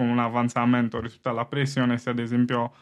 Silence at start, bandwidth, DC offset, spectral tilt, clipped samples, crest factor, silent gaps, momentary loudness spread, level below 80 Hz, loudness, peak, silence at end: 0 s; 10 kHz; under 0.1%; -6.5 dB/octave; under 0.1%; 16 dB; none; 7 LU; -60 dBFS; -25 LUFS; -10 dBFS; 0.15 s